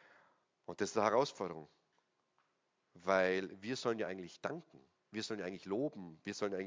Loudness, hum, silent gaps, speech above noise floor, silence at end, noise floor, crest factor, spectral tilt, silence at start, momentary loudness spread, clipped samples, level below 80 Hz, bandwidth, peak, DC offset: -39 LUFS; none; none; 43 dB; 0 s; -82 dBFS; 24 dB; -4.5 dB/octave; 0.7 s; 15 LU; under 0.1%; -78 dBFS; 7.6 kHz; -16 dBFS; under 0.1%